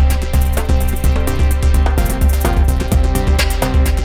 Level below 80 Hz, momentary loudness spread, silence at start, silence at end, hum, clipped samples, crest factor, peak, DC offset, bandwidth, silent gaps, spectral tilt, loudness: -14 dBFS; 2 LU; 0 s; 0 s; none; under 0.1%; 12 dB; 0 dBFS; under 0.1%; 16.5 kHz; none; -5.5 dB/octave; -16 LUFS